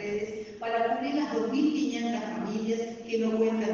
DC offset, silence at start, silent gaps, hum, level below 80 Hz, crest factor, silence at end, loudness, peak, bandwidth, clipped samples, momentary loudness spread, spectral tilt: under 0.1%; 0 s; none; none; -68 dBFS; 14 dB; 0 s; -30 LUFS; -16 dBFS; 7.4 kHz; under 0.1%; 6 LU; -5.5 dB/octave